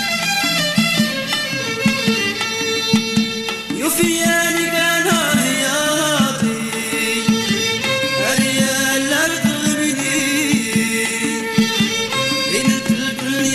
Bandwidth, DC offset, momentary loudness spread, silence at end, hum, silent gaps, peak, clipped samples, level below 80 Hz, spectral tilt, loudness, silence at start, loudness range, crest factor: 14 kHz; under 0.1%; 4 LU; 0 s; none; none; -2 dBFS; under 0.1%; -52 dBFS; -3 dB/octave; -16 LUFS; 0 s; 1 LU; 16 dB